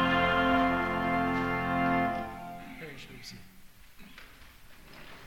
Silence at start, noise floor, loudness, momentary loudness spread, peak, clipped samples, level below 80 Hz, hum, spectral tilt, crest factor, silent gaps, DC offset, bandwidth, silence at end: 0 s; -52 dBFS; -28 LUFS; 25 LU; -14 dBFS; under 0.1%; -50 dBFS; none; -6 dB/octave; 18 dB; none; under 0.1%; 16.5 kHz; 0 s